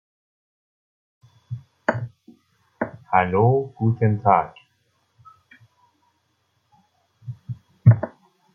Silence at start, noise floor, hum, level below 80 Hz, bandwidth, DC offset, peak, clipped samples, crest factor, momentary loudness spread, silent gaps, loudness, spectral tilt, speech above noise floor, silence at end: 1.5 s; -69 dBFS; none; -58 dBFS; 4.8 kHz; under 0.1%; -2 dBFS; under 0.1%; 22 dB; 20 LU; none; -21 LUFS; -10 dB/octave; 50 dB; 0.45 s